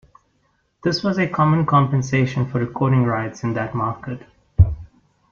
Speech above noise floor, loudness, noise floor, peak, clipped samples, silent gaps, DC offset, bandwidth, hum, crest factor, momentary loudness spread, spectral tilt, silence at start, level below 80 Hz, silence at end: 46 dB; -20 LUFS; -65 dBFS; -2 dBFS; under 0.1%; none; under 0.1%; 7.2 kHz; none; 18 dB; 12 LU; -7 dB/octave; 0.85 s; -34 dBFS; 0.45 s